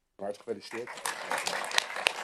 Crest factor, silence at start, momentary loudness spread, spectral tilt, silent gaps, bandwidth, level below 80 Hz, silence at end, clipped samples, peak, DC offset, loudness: 30 dB; 0.2 s; 11 LU; -0.5 dB/octave; none; 14.5 kHz; -76 dBFS; 0 s; under 0.1%; -4 dBFS; under 0.1%; -33 LUFS